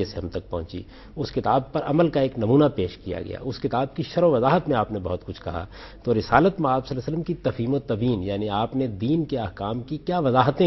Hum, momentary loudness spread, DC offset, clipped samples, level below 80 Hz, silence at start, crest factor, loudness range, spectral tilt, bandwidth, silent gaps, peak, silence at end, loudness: none; 13 LU; under 0.1%; under 0.1%; -46 dBFS; 0 s; 22 dB; 3 LU; -8.5 dB/octave; 6.2 kHz; none; -2 dBFS; 0 s; -24 LUFS